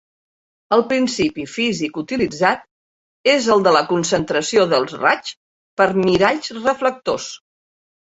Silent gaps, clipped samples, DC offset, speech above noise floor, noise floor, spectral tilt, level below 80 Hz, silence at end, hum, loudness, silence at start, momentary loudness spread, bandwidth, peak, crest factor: 2.71-3.24 s, 5.37-5.77 s; under 0.1%; under 0.1%; over 73 dB; under -90 dBFS; -4 dB/octave; -54 dBFS; 0.85 s; none; -18 LUFS; 0.7 s; 9 LU; 8.2 kHz; -2 dBFS; 18 dB